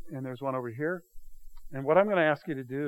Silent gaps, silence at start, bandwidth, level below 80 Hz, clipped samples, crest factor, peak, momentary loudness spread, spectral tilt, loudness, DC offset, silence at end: none; 0 s; 16.5 kHz; -54 dBFS; under 0.1%; 22 dB; -8 dBFS; 15 LU; -8 dB/octave; -29 LUFS; under 0.1%; 0 s